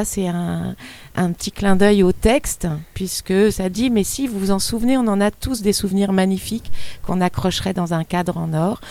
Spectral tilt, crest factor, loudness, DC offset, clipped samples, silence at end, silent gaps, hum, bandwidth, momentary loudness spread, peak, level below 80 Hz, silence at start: -5.5 dB/octave; 18 dB; -19 LUFS; under 0.1%; under 0.1%; 0 s; none; none; 16 kHz; 10 LU; 0 dBFS; -36 dBFS; 0 s